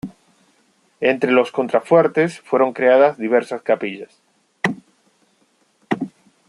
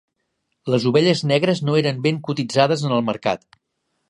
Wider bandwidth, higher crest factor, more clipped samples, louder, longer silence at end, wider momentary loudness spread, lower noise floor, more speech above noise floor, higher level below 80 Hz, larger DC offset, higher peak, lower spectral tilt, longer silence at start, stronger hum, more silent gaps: about the same, 11 kHz vs 11.5 kHz; about the same, 18 dB vs 20 dB; neither; about the same, -18 LUFS vs -19 LUFS; second, 0.4 s vs 0.7 s; first, 13 LU vs 8 LU; second, -61 dBFS vs -74 dBFS; second, 45 dB vs 55 dB; about the same, -68 dBFS vs -64 dBFS; neither; about the same, -2 dBFS vs -2 dBFS; about the same, -6.5 dB/octave vs -6 dB/octave; second, 0.05 s vs 0.65 s; neither; neither